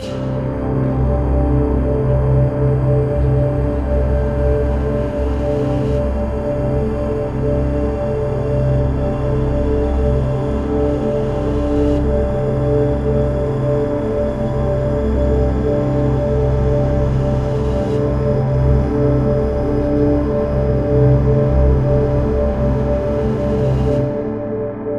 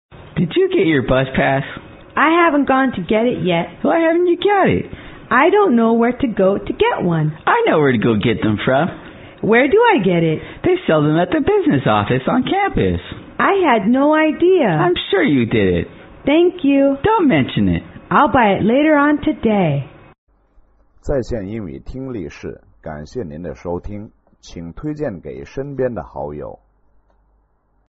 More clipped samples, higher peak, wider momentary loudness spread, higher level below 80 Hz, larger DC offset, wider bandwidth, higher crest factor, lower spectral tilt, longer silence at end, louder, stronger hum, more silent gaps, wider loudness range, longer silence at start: neither; about the same, -2 dBFS vs 0 dBFS; second, 4 LU vs 16 LU; first, -22 dBFS vs -40 dBFS; first, 0.3% vs under 0.1%; about the same, 7.2 kHz vs 7 kHz; about the same, 14 dB vs 16 dB; first, -10 dB/octave vs -5 dB/octave; second, 0 s vs 1.35 s; about the same, -17 LUFS vs -16 LUFS; neither; second, none vs 20.18-20.27 s; second, 3 LU vs 12 LU; second, 0 s vs 0.15 s